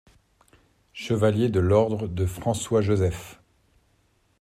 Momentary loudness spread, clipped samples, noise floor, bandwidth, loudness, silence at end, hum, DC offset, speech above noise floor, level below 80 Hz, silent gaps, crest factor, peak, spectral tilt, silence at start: 17 LU; under 0.1%; -66 dBFS; 15 kHz; -24 LUFS; 1.05 s; none; under 0.1%; 43 dB; -52 dBFS; none; 18 dB; -8 dBFS; -6.5 dB/octave; 0.95 s